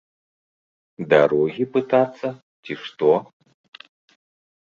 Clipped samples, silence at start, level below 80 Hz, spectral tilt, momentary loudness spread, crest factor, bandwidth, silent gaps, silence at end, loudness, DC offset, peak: under 0.1%; 1 s; -66 dBFS; -7.5 dB/octave; 17 LU; 20 dB; 7.2 kHz; 2.42-2.63 s; 1.45 s; -20 LUFS; under 0.1%; -2 dBFS